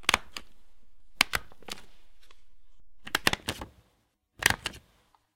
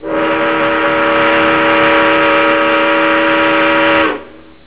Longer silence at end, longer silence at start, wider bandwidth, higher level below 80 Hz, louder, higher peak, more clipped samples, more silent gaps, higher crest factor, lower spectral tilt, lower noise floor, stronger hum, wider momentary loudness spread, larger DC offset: second, 0 s vs 0.35 s; about the same, 0 s vs 0 s; first, 17 kHz vs 4 kHz; second, -52 dBFS vs -42 dBFS; second, -29 LUFS vs -10 LUFS; about the same, 0 dBFS vs 0 dBFS; neither; neither; first, 34 dB vs 12 dB; second, -1.5 dB/octave vs -7.5 dB/octave; first, -72 dBFS vs -33 dBFS; neither; first, 18 LU vs 4 LU; second, under 0.1% vs 0.9%